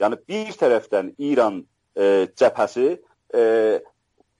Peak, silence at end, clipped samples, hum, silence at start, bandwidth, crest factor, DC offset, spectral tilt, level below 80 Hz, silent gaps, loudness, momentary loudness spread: -6 dBFS; 0.55 s; under 0.1%; none; 0 s; 11 kHz; 16 dB; under 0.1%; -5.5 dB/octave; -72 dBFS; none; -21 LUFS; 10 LU